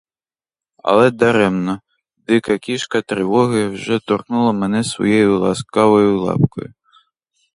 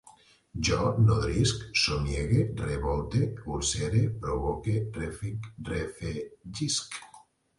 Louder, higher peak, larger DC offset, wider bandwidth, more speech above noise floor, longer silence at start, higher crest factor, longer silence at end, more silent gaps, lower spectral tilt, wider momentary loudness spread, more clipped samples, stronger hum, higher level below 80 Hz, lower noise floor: first, -16 LUFS vs -29 LUFS; first, 0 dBFS vs -12 dBFS; neither; about the same, 11 kHz vs 11.5 kHz; first, over 74 dB vs 29 dB; first, 0.85 s vs 0.05 s; about the same, 16 dB vs 18 dB; first, 0.9 s vs 0.4 s; neither; about the same, -6 dB/octave vs -5 dB/octave; second, 8 LU vs 12 LU; neither; neither; second, -52 dBFS vs -42 dBFS; first, under -90 dBFS vs -58 dBFS